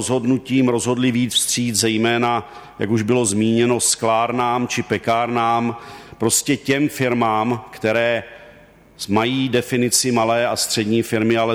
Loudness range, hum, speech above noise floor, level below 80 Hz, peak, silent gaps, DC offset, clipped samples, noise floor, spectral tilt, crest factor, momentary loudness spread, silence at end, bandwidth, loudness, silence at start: 2 LU; none; 28 dB; -56 dBFS; -4 dBFS; none; under 0.1%; under 0.1%; -47 dBFS; -4 dB/octave; 14 dB; 7 LU; 0 s; 17.5 kHz; -18 LUFS; 0 s